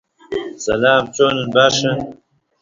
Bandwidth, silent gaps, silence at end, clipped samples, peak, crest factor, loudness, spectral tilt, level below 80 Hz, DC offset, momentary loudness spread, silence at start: 7.6 kHz; none; 0.45 s; under 0.1%; 0 dBFS; 18 dB; -16 LUFS; -3.5 dB/octave; -50 dBFS; under 0.1%; 13 LU; 0.3 s